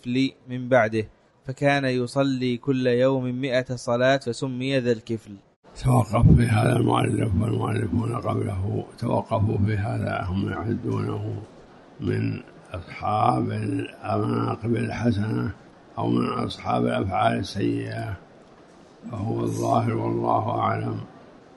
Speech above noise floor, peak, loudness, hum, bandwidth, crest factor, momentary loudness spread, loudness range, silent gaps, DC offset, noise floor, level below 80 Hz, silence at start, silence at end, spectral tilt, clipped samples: 26 dB; -4 dBFS; -24 LUFS; none; 11.5 kHz; 20 dB; 12 LU; 5 LU; 5.56-5.63 s; under 0.1%; -50 dBFS; -42 dBFS; 0.05 s; 0.25 s; -7 dB/octave; under 0.1%